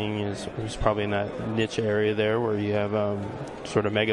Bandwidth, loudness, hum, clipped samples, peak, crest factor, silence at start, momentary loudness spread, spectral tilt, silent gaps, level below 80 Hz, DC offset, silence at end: 11 kHz; -27 LUFS; none; under 0.1%; -6 dBFS; 20 dB; 0 s; 9 LU; -6 dB/octave; none; -46 dBFS; under 0.1%; 0 s